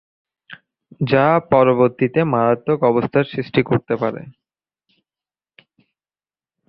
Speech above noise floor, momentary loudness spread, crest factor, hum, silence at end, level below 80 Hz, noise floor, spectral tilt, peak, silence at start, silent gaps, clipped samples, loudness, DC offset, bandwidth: over 73 dB; 8 LU; 18 dB; none; 2.4 s; -56 dBFS; under -90 dBFS; -10.5 dB/octave; -2 dBFS; 0.5 s; none; under 0.1%; -17 LUFS; under 0.1%; 5.6 kHz